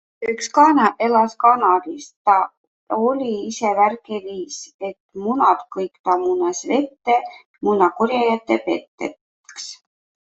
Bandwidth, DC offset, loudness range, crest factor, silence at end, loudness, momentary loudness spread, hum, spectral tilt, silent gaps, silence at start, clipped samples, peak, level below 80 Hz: 8.2 kHz; under 0.1%; 4 LU; 18 dB; 0.6 s; -19 LUFS; 16 LU; none; -4 dB/octave; 2.16-2.25 s, 2.57-2.87 s, 4.74-4.79 s, 5.00-5.09 s, 5.99-6.04 s, 7.46-7.54 s, 8.88-8.98 s, 9.21-9.44 s; 0.2 s; under 0.1%; -2 dBFS; -66 dBFS